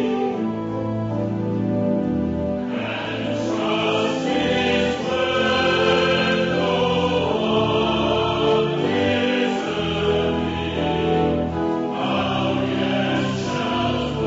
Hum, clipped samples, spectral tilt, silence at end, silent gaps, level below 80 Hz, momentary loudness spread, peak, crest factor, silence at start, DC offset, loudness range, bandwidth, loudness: none; under 0.1%; -6 dB/octave; 0 s; none; -44 dBFS; 6 LU; -6 dBFS; 14 dB; 0 s; under 0.1%; 4 LU; 8 kHz; -21 LUFS